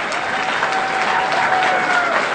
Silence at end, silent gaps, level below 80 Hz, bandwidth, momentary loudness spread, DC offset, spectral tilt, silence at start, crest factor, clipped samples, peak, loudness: 0 s; none; -56 dBFS; 9.4 kHz; 4 LU; under 0.1%; -2.5 dB/octave; 0 s; 16 dB; under 0.1%; 0 dBFS; -17 LUFS